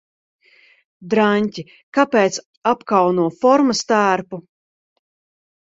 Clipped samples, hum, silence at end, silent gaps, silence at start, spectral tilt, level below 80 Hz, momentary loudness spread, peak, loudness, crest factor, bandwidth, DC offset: under 0.1%; none; 1.4 s; 1.83-1.92 s, 2.46-2.62 s; 1 s; -5 dB/octave; -64 dBFS; 9 LU; 0 dBFS; -17 LUFS; 20 dB; 8 kHz; under 0.1%